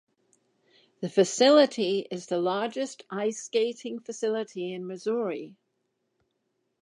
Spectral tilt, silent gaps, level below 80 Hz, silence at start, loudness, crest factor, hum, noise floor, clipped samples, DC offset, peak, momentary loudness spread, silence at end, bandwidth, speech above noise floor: -4 dB/octave; none; -86 dBFS; 1 s; -27 LUFS; 20 dB; none; -77 dBFS; under 0.1%; under 0.1%; -8 dBFS; 15 LU; 1.3 s; 11 kHz; 51 dB